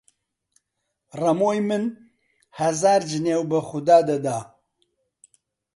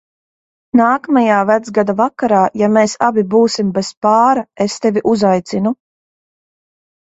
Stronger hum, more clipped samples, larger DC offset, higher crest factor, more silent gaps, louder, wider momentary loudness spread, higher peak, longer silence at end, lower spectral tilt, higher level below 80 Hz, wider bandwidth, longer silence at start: neither; neither; neither; first, 20 dB vs 14 dB; second, none vs 3.97-4.01 s; second, -22 LUFS vs -14 LUFS; first, 11 LU vs 6 LU; second, -4 dBFS vs 0 dBFS; about the same, 1.3 s vs 1.3 s; about the same, -5.5 dB/octave vs -5.5 dB/octave; second, -68 dBFS vs -58 dBFS; first, 11.5 kHz vs 8 kHz; first, 1.15 s vs 0.75 s